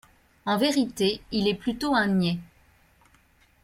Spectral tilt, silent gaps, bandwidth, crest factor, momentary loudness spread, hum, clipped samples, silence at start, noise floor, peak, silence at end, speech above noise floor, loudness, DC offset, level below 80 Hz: -5 dB/octave; none; 16 kHz; 16 dB; 6 LU; none; under 0.1%; 0.45 s; -61 dBFS; -10 dBFS; 1.2 s; 36 dB; -26 LUFS; under 0.1%; -56 dBFS